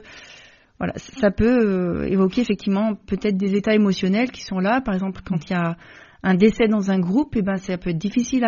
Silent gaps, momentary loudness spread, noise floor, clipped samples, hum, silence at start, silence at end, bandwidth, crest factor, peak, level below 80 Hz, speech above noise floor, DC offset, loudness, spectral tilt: none; 10 LU; -48 dBFS; under 0.1%; none; 0.05 s; 0 s; 7.2 kHz; 18 dB; -2 dBFS; -42 dBFS; 28 dB; under 0.1%; -21 LUFS; -6 dB/octave